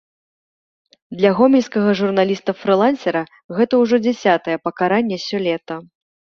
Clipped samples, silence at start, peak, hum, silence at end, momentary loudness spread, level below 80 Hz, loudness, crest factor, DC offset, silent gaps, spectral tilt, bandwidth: under 0.1%; 1.1 s; -2 dBFS; none; 0.55 s; 10 LU; -62 dBFS; -17 LUFS; 16 dB; under 0.1%; 3.44-3.49 s; -6.5 dB/octave; 7.2 kHz